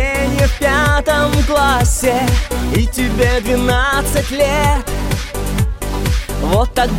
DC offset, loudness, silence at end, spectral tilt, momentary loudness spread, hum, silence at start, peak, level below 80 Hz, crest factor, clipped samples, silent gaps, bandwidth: under 0.1%; -15 LUFS; 0 s; -5 dB/octave; 6 LU; none; 0 s; -2 dBFS; -20 dBFS; 14 dB; under 0.1%; none; 16.5 kHz